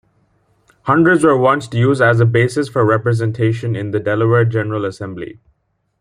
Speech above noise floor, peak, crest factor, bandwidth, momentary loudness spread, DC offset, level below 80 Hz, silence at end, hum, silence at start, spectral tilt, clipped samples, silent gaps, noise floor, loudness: 50 dB; -2 dBFS; 14 dB; 10.5 kHz; 13 LU; under 0.1%; -54 dBFS; 0.7 s; none; 0.85 s; -7.5 dB/octave; under 0.1%; none; -65 dBFS; -15 LUFS